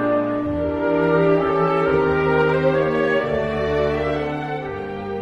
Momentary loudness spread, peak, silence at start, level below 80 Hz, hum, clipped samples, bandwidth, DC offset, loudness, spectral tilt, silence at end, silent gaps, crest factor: 9 LU; -6 dBFS; 0 s; -40 dBFS; none; under 0.1%; 7.6 kHz; under 0.1%; -20 LUFS; -8 dB/octave; 0 s; none; 14 dB